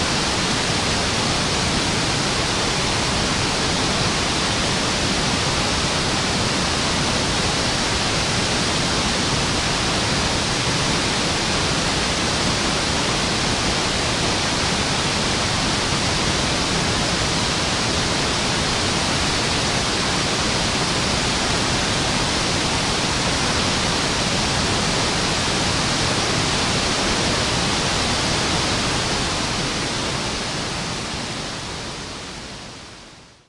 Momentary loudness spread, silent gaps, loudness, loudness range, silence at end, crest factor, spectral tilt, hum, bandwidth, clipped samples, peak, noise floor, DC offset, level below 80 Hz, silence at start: 3 LU; none; -19 LUFS; 1 LU; 0.25 s; 14 dB; -3 dB/octave; none; 11.5 kHz; under 0.1%; -6 dBFS; -44 dBFS; under 0.1%; -36 dBFS; 0 s